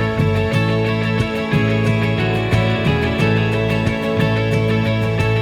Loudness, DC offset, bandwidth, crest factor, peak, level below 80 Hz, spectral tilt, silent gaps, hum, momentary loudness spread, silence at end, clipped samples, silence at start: -17 LUFS; under 0.1%; 13.5 kHz; 14 dB; -4 dBFS; -36 dBFS; -7 dB/octave; none; none; 2 LU; 0 s; under 0.1%; 0 s